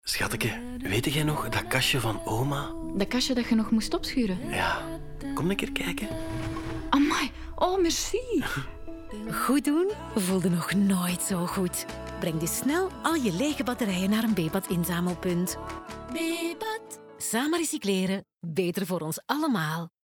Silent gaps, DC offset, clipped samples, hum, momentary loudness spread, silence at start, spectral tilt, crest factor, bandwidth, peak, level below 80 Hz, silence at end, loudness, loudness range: none; under 0.1%; under 0.1%; none; 9 LU; 0.05 s; -4.5 dB/octave; 18 dB; 19.5 kHz; -10 dBFS; -44 dBFS; 0.15 s; -28 LUFS; 3 LU